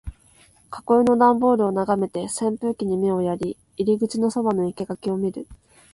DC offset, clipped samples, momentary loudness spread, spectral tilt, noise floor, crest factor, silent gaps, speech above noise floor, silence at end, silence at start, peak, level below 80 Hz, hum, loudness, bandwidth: under 0.1%; under 0.1%; 14 LU; -6.5 dB/octave; -55 dBFS; 18 dB; none; 34 dB; 0.4 s; 0.05 s; -4 dBFS; -50 dBFS; none; -22 LUFS; 11.5 kHz